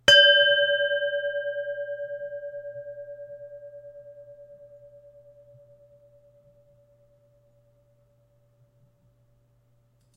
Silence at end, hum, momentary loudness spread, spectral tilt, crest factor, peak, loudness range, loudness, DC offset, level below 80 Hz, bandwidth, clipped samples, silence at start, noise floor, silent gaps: 5.5 s; none; 29 LU; -0.5 dB/octave; 26 dB; -2 dBFS; 28 LU; -22 LUFS; under 0.1%; -64 dBFS; 15.5 kHz; under 0.1%; 0.05 s; -64 dBFS; none